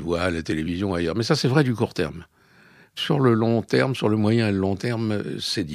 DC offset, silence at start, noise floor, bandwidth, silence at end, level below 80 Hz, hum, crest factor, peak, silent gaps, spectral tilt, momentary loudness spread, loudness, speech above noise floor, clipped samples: under 0.1%; 0 s; -53 dBFS; 14.5 kHz; 0 s; -50 dBFS; none; 18 dB; -4 dBFS; none; -6 dB/octave; 7 LU; -23 LUFS; 31 dB; under 0.1%